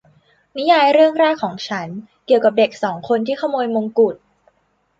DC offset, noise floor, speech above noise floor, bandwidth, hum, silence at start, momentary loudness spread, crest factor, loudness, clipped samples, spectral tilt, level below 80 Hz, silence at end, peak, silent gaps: under 0.1%; -64 dBFS; 47 dB; 7.8 kHz; none; 0.55 s; 14 LU; 16 dB; -17 LUFS; under 0.1%; -5.5 dB/octave; -66 dBFS; 0.85 s; -2 dBFS; none